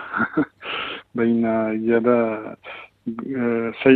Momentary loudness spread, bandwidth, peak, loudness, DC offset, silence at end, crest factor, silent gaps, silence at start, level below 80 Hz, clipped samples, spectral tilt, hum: 14 LU; 4.4 kHz; -2 dBFS; -22 LUFS; under 0.1%; 0 s; 20 dB; none; 0 s; -60 dBFS; under 0.1%; -9 dB/octave; none